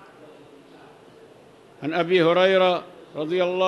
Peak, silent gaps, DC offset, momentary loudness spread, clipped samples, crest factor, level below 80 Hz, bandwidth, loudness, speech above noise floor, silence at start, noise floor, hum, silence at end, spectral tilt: -6 dBFS; none; under 0.1%; 15 LU; under 0.1%; 16 dB; -74 dBFS; 11 kHz; -21 LUFS; 30 dB; 1.8 s; -50 dBFS; none; 0 s; -6 dB/octave